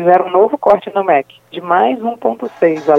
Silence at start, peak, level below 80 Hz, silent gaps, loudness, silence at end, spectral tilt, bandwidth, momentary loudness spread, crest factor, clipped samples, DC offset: 0 s; 0 dBFS; -58 dBFS; none; -14 LUFS; 0 s; -7 dB/octave; 7.4 kHz; 8 LU; 14 dB; under 0.1%; under 0.1%